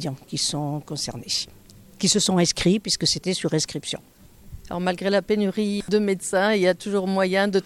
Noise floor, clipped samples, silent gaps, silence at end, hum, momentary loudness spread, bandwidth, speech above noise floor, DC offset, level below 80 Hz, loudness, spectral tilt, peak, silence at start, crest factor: -43 dBFS; under 0.1%; none; 0.05 s; none; 10 LU; 15 kHz; 20 dB; under 0.1%; -52 dBFS; -23 LUFS; -4 dB/octave; -8 dBFS; 0 s; 16 dB